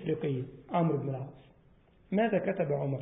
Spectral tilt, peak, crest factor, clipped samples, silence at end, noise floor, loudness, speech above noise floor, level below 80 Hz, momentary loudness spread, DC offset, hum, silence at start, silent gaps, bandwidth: -5.5 dB/octave; -16 dBFS; 16 dB; under 0.1%; 0 s; -62 dBFS; -32 LUFS; 31 dB; -64 dBFS; 9 LU; under 0.1%; none; 0 s; none; 3.8 kHz